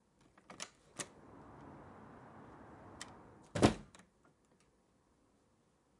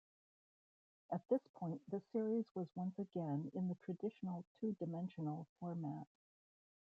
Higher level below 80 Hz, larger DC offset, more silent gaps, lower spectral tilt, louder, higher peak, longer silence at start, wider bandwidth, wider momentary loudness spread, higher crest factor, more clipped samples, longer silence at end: first, -62 dBFS vs -88 dBFS; neither; second, none vs 1.49-1.54 s, 2.51-2.55 s, 4.47-4.55 s, 5.49-5.56 s; second, -5 dB/octave vs -10 dB/octave; first, -39 LUFS vs -45 LUFS; first, -12 dBFS vs -26 dBFS; second, 0.5 s vs 1.1 s; first, 11.5 kHz vs 5.2 kHz; first, 25 LU vs 8 LU; first, 32 dB vs 20 dB; neither; first, 2.15 s vs 0.9 s